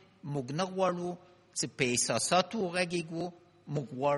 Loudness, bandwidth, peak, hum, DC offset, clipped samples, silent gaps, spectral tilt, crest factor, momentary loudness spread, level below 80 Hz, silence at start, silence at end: -32 LUFS; 11.5 kHz; -12 dBFS; none; under 0.1%; under 0.1%; none; -3.5 dB/octave; 20 dB; 12 LU; -70 dBFS; 0.25 s; 0 s